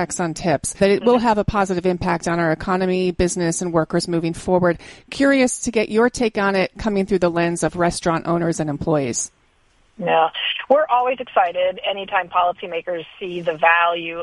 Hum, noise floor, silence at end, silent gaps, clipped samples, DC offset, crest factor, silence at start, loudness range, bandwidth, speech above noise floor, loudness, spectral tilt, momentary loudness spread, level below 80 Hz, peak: none; -58 dBFS; 0 s; none; under 0.1%; under 0.1%; 18 dB; 0 s; 2 LU; 11.5 kHz; 39 dB; -19 LUFS; -4.5 dB/octave; 8 LU; -42 dBFS; -2 dBFS